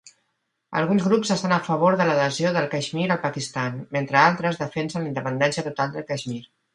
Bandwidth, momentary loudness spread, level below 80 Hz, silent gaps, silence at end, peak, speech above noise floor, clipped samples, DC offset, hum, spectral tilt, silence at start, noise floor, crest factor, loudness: 11 kHz; 10 LU; -64 dBFS; none; 0.3 s; -2 dBFS; 52 dB; under 0.1%; under 0.1%; none; -5.5 dB/octave; 0.05 s; -75 dBFS; 22 dB; -23 LUFS